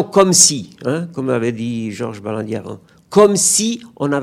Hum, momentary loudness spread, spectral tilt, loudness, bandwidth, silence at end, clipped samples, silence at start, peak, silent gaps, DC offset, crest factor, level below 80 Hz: none; 15 LU; -3.5 dB/octave; -15 LUFS; over 20 kHz; 0 s; 0.2%; 0 s; 0 dBFS; none; under 0.1%; 16 dB; -58 dBFS